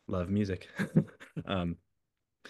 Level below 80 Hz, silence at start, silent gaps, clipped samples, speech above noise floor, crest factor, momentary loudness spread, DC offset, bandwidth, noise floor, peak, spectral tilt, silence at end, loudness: -58 dBFS; 0.1 s; none; under 0.1%; 53 dB; 22 dB; 11 LU; under 0.1%; 12.5 kHz; -85 dBFS; -12 dBFS; -7.5 dB/octave; 0 s; -34 LUFS